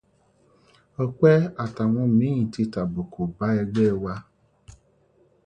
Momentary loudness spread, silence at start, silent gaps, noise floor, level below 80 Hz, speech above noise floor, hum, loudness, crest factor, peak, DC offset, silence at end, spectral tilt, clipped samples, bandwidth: 12 LU; 1 s; none; -62 dBFS; -52 dBFS; 40 dB; none; -23 LUFS; 18 dB; -6 dBFS; under 0.1%; 0.75 s; -9 dB/octave; under 0.1%; 8.8 kHz